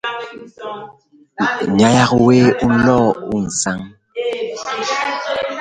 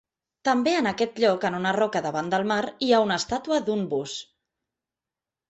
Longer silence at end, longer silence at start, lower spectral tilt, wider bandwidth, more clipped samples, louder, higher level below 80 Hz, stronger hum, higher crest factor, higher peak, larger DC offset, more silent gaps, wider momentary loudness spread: second, 0 s vs 1.25 s; second, 0.05 s vs 0.45 s; about the same, -5 dB/octave vs -4.5 dB/octave; first, 9.4 kHz vs 8.2 kHz; neither; first, -16 LUFS vs -24 LUFS; first, -46 dBFS vs -62 dBFS; neither; about the same, 16 dB vs 18 dB; first, 0 dBFS vs -8 dBFS; neither; neither; first, 18 LU vs 7 LU